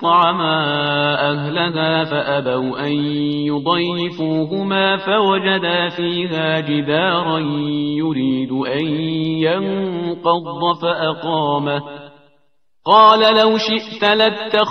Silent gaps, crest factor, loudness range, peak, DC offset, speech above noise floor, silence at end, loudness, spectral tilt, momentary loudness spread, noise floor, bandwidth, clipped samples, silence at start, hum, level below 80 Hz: none; 16 dB; 4 LU; 0 dBFS; 0.1%; 49 dB; 0 s; -17 LUFS; -6.5 dB/octave; 7 LU; -66 dBFS; 6.4 kHz; under 0.1%; 0 s; none; -60 dBFS